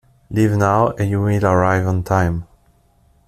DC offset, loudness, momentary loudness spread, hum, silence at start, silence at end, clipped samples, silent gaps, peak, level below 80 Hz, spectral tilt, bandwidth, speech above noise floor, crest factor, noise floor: under 0.1%; -17 LUFS; 6 LU; none; 0.3 s; 0.85 s; under 0.1%; none; -2 dBFS; -42 dBFS; -8 dB/octave; 14 kHz; 40 dB; 16 dB; -56 dBFS